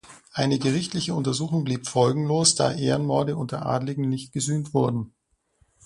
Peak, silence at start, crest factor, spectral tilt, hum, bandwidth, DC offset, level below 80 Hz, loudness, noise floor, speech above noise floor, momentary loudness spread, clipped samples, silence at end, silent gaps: -4 dBFS; 0.1 s; 20 dB; -5 dB/octave; none; 11.5 kHz; under 0.1%; -58 dBFS; -24 LUFS; -66 dBFS; 42 dB; 8 LU; under 0.1%; 0.75 s; none